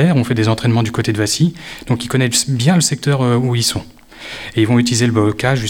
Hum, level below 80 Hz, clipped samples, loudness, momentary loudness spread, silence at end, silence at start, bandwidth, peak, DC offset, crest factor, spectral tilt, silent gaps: none; -44 dBFS; under 0.1%; -15 LUFS; 9 LU; 0 s; 0 s; 17 kHz; 0 dBFS; under 0.1%; 14 dB; -5 dB/octave; none